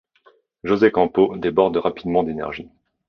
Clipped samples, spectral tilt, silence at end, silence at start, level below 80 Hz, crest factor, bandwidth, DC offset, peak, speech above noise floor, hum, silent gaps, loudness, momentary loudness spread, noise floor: under 0.1%; -8 dB/octave; 0.45 s; 0.65 s; -52 dBFS; 18 dB; 6.2 kHz; under 0.1%; -2 dBFS; 38 dB; none; none; -20 LUFS; 13 LU; -57 dBFS